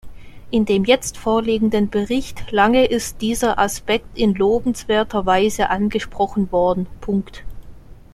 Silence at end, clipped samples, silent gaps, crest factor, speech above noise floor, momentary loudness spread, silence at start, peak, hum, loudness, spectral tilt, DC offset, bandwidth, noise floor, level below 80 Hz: 0.2 s; under 0.1%; none; 16 dB; 20 dB; 7 LU; 0.05 s; -2 dBFS; none; -19 LUFS; -5 dB/octave; under 0.1%; 15 kHz; -39 dBFS; -38 dBFS